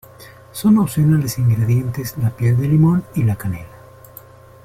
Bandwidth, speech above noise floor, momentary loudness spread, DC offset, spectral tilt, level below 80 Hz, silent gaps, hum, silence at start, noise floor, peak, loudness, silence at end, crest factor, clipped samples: 16.5 kHz; 26 dB; 10 LU; under 0.1%; -7.5 dB/octave; -46 dBFS; none; none; 0.2 s; -42 dBFS; -4 dBFS; -17 LUFS; 0.9 s; 14 dB; under 0.1%